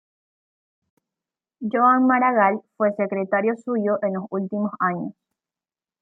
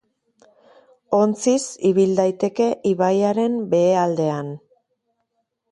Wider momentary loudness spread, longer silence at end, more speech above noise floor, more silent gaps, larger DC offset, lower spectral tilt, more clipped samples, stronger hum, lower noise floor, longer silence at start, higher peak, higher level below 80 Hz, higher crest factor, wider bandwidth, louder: first, 10 LU vs 6 LU; second, 0.9 s vs 1.15 s; first, over 69 dB vs 55 dB; neither; neither; first, -9.5 dB/octave vs -6 dB/octave; neither; neither; first, under -90 dBFS vs -74 dBFS; first, 1.6 s vs 1.1 s; about the same, -4 dBFS vs -4 dBFS; second, -76 dBFS vs -66 dBFS; about the same, 18 dB vs 16 dB; second, 7.6 kHz vs 11.5 kHz; about the same, -21 LUFS vs -19 LUFS